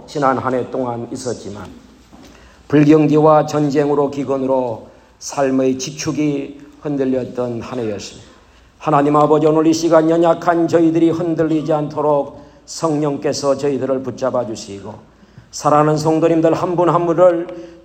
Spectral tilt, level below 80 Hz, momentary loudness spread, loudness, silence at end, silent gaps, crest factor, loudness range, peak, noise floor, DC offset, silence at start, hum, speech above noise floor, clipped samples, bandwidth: -6.5 dB/octave; -52 dBFS; 16 LU; -16 LUFS; 0.1 s; none; 16 dB; 6 LU; 0 dBFS; -47 dBFS; under 0.1%; 0 s; none; 31 dB; under 0.1%; 14 kHz